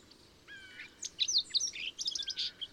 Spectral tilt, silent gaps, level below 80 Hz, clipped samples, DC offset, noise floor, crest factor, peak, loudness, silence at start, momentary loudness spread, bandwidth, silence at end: 2.5 dB/octave; none; -72 dBFS; under 0.1%; under 0.1%; -59 dBFS; 18 dB; -20 dBFS; -33 LUFS; 0.45 s; 20 LU; 16.5 kHz; 0 s